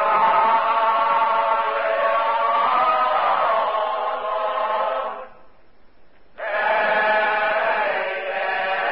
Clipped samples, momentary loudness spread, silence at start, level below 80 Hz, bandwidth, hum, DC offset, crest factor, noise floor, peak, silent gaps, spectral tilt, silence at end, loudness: under 0.1%; 7 LU; 0 s; -62 dBFS; 5.6 kHz; none; 0.5%; 14 dB; -53 dBFS; -8 dBFS; none; -7 dB/octave; 0 s; -20 LUFS